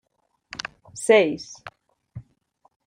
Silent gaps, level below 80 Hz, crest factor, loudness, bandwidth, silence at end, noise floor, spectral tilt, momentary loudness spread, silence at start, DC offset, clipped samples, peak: none; -64 dBFS; 22 dB; -22 LUFS; 11.5 kHz; 0.65 s; -69 dBFS; -3.5 dB/octave; 26 LU; 0.95 s; under 0.1%; under 0.1%; -4 dBFS